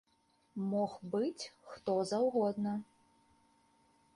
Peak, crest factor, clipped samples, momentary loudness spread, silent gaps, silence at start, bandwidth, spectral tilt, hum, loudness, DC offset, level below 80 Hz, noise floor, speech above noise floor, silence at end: -22 dBFS; 16 dB; under 0.1%; 13 LU; none; 0.55 s; 11.5 kHz; -6.5 dB/octave; none; -36 LUFS; under 0.1%; -78 dBFS; -74 dBFS; 38 dB; 1.35 s